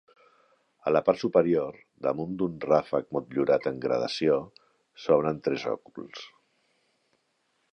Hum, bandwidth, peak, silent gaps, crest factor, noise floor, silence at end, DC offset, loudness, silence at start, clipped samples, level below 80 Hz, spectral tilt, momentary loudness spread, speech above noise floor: none; 9 kHz; -8 dBFS; none; 20 dB; -74 dBFS; 1.45 s; under 0.1%; -27 LUFS; 0.85 s; under 0.1%; -64 dBFS; -6.5 dB/octave; 16 LU; 47 dB